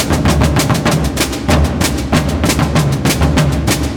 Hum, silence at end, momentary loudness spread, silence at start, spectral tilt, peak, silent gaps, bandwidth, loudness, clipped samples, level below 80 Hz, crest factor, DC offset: none; 0 s; 3 LU; 0 s; -5 dB/octave; 0 dBFS; none; over 20 kHz; -13 LUFS; under 0.1%; -20 dBFS; 12 dB; 0.4%